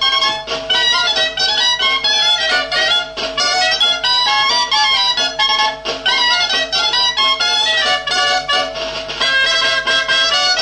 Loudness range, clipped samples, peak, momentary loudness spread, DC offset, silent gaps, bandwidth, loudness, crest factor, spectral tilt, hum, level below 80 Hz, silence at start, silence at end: 1 LU; under 0.1%; -2 dBFS; 5 LU; under 0.1%; none; 10.5 kHz; -13 LUFS; 14 dB; 0.5 dB/octave; none; -46 dBFS; 0 s; 0 s